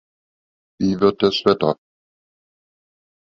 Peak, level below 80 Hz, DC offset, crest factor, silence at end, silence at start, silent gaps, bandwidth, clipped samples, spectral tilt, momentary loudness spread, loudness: -2 dBFS; -54 dBFS; under 0.1%; 20 dB; 1.5 s; 0.8 s; none; 7.2 kHz; under 0.1%; -6.5 dB/octave; 7 LU; -19 LUFS